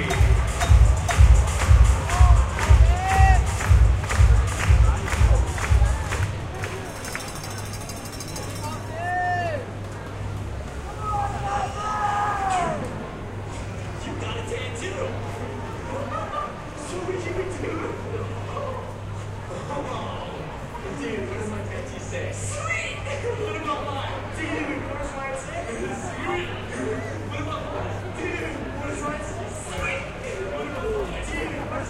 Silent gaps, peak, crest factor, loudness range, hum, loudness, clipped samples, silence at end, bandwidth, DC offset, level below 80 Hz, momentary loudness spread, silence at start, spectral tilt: none; -4 dBFS; 20 dB; 12 LU; none; -25 LUFS; under 0.1%; 0 s; 14 kHz; under 0.1%; -26 dBFS; 14 LU; 0 s; -5.5 dB/octave